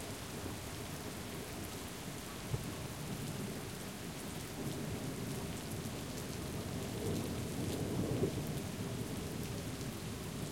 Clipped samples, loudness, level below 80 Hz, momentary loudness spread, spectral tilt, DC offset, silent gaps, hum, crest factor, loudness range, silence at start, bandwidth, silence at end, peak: under 0.1%; -42 LUFS; -56 dBFS; 6 LU; -5 dB/octave; under 0.1%; none; none; 20 dB; 4 LU; 0 s; 17 kHz; 0 s; -22 dBFS